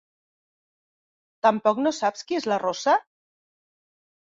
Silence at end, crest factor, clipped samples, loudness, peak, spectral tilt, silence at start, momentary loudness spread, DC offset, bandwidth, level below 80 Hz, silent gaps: 1.3 s; 20 dB; under 0.1%; -24 LUFS; -6 dBFS; -4 dB/octave; 1.45 s; 5 LU; under 0.1%; 7.8 kHz; -74 dBFS; none